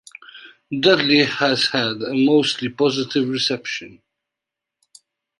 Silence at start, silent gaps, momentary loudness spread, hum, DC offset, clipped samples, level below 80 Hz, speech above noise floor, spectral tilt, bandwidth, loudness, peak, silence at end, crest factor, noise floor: 0.35 s; none; 14 LU; none; under 0.1%; under 0.1%; -64 dBFS; 66 dB; -4.5 dB/octave; 11.5 kHz; -18 LUFS; -2 dBFS; 1.5 s; 20 dB; -85 dBFS